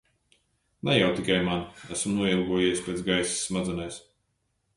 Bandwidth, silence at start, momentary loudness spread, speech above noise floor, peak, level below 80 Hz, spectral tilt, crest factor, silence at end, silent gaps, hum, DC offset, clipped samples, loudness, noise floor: 11.5 kHz; 0.85 s; 11 LU; 48 dB; -8 dBFS; -54 dBFS; -4 dB/octave; 20 dB; 0.75 s; none; none; under 0.1%; under 0.1%; -27 LUFS; -75 dBFS